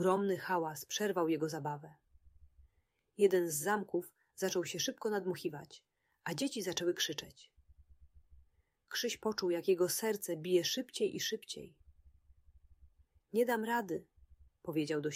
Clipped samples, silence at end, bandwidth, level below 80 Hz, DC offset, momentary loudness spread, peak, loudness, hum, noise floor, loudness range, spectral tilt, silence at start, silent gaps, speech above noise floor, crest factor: under 0.1%; 0 s; 16 kHz; -70 dBFS; under 0.1%; 13 LU; -18 dBFS; -36 LUFS; none; -78 dBFS; 5 LU; -3.5 dB/octave; 0 s; none; 43 dB; 20 dB